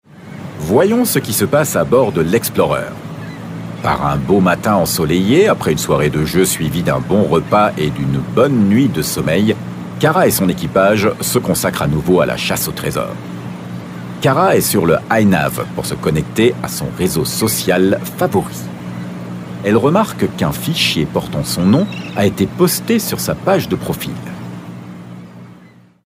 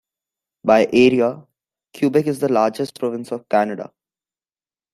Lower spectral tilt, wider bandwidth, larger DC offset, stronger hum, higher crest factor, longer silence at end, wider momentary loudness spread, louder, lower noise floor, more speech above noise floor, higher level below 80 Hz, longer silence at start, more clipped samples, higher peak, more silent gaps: about the same, -5 dB/octave vs -6 dB/octave; first, 16 kHz vs 14 kHz; neither; neither; about the same, 16 dB vs 18 dB; second, 0.5 s vs 1.1 s; about the same, 15 LU vs 14 LU; first, -15 LUFS vs -18 LUFS; second, -43 dBFS vs under -90 dBFS; second, 29 dB vs over 72 dB; first, -40 dBFS vs -62 dBFS; second, 0.15 s vs 0.65 s; neither; about the same, 0 dBFS vs -2 dBFS; neither